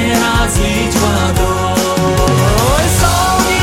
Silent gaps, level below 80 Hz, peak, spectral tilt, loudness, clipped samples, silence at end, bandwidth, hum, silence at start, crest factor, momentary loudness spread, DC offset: none; -20 dBFS; 0 dBFS; -4.5 dB/octave; -12 LUFS; under 0.1%; 0 s; 16.5 kHz; none; 0 s; 12 dB; 2 LU; 0.9%